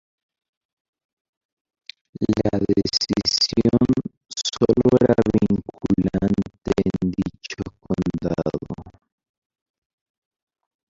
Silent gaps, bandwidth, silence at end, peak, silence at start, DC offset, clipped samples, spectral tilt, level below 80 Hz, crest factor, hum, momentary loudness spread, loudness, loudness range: 4.17-4.21 s; 7.8 kHz; 2 s; -2 dBFS; 2.2 s; under 0.1%; under 0.1%; -6 dB/octave; -44 dBFS; 20 dB; none; 14 LU; -21 LUFS; 9 LU